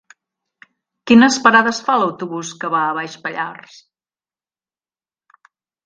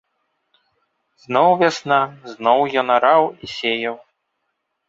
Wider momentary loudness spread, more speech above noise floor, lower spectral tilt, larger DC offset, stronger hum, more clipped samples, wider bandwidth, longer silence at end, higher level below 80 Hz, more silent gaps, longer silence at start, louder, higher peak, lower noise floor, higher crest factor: first, 15 LU vs 10 LU; first, over 74 dB vs 57 dB; about the same, -3.5 dB/octave vs -4.5 dB/octave; neither; neither; neither; first, 9.2 kHz vs 7.8 kHz; first, 2.3 s vs 0.9 s; about the same, -62 dBFS vs -64 dBFS; neither; second, 1.05 s vs 1.3 s; about the same, -16 LUFS vs -18 LUFS; about the same, 0 dBFS vs -2 dBFS; first, under -90 dBFS vs -74 dBFS; about the same, 20 dB vs 18 dB